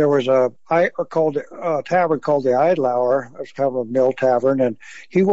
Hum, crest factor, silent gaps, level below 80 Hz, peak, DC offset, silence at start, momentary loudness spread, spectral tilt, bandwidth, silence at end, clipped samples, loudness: none; 12 dB; none; -70 dBFS; -6 dBFS; 0.5%; 0 s; 7 LU; -7.5 dB/octave; 7.8 kHz; 0 s; under 0.1%; -19 LUFS